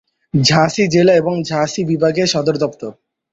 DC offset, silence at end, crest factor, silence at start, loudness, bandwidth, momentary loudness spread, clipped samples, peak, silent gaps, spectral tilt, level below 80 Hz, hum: under 0.1%; 0.4 s; 16 dB; 0.35 s; -15 LUFS; 8 kHz; 9 LU; under 0.1%; 0 dBFS; none; -5 dB/octave; -52 dBFS; none